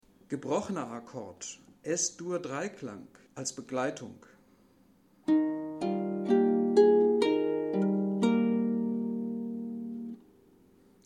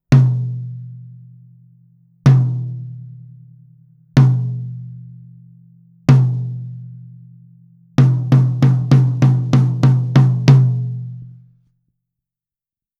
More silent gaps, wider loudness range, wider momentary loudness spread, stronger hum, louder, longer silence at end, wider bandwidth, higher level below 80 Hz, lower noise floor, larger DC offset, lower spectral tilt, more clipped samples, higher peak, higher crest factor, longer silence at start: neither; about the same, 9 LU vs 8 LU; second, 18 LU vs 22 LU; neither; second, -30 LUFS vs -15 LUFS; second, 0.9 s vs 1.7 s; first, 11 kHz vs 6.8 kHz; second, -74 dBFS vs -50 dBFS; second, -63 dBFS vs under -90 dBFS; neither; second, -5.5 dB/octave vs -8.5 dB/octave; neither; second, -12 dBFS vs 0 dBFS; about the same, 20 dB vs 16 dB; first, 0.3 s vs 0.1 s